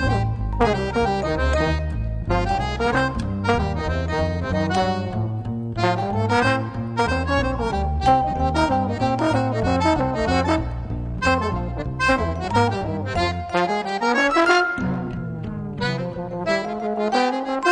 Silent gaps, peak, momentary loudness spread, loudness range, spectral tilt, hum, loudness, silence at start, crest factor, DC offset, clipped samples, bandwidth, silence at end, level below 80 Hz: none; -2 dBFS; 8 LU; 2 LU; -6 dB/octave; none; -22 LUFS; 0 s; 20 dB; under 0.1%; under 0.1%; 10 kHz; 0 s; -32 dBFS